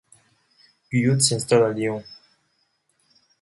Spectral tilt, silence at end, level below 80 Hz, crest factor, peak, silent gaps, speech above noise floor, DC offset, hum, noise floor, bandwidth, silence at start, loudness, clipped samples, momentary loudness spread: -4.5 dB/octave; 1.25 s; -62 dBFS; 20 dB; -4 dBFS; none; 49 dB; under 0.1%; none; -69 dBFS; 12 kHz; 0.9 s; -21 LUFS; under 0.1%; 9 LU